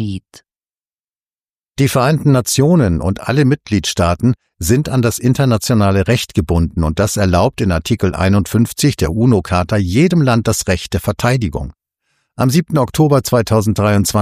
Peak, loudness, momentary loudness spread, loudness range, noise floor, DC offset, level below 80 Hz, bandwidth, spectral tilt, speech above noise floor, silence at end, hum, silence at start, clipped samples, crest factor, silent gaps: 0 dBFS; -14 LUFS; 5 LU; 2 LU; under -90 dBFS; under 0.1%; -36 dBFS; 15.5 kHz; -6 dB/octave; over 76 dB; 0 s; none; 0 s; under 0.1%; 14 dB; 0.70-0.74 s, 0.87-1.14 s, 1.21-1.39 s, 1.49-1.54 s